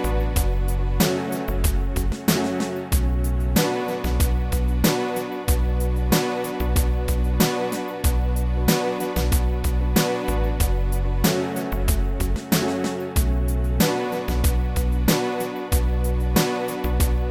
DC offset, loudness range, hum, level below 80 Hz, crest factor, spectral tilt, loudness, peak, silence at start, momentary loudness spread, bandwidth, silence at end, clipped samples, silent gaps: under 0.1%; 1 LU; none; -24 dBFS; 16 dB; -5 dB/octave; -23 LUFS; -6 dBFS; 0 s; 4 LU; 17 kHz; 0 s; under 0.1%; none